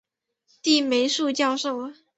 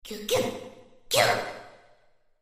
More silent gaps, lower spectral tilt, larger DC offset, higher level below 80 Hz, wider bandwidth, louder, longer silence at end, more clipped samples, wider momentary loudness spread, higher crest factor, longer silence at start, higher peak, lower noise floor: neither; about the same, -1.5 dB/octave vs -2.5 dB/octave; neither; second, -72 dBFS vs -58 dBFS; second, 8.2 kHz vs 15.5 kHz; first, -23 LUFS vs -26 LUFS; second, 0.25 s vs 0.65 s; neither; second, 9 LU vs 21 LU; about the same, 18 dB vs 22 dB; first, 0.65 s vs 0.05 s; about the same, -6 dBFS vs -8 dBFS; first, -69 dBFS vs -61 dBFS